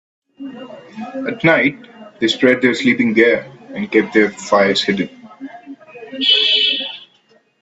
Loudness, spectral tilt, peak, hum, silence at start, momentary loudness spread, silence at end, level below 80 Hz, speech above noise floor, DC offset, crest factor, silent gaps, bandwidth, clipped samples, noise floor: -15 LUFS; -4 dB/octave; 0 dBFS; none; 0.4 s; 22 LU; 0.6 s; -60 dBFS; 40 dB; under 0.1%; 18 dB; none; 8.2 kHz; under 0.1%; -55 dBFS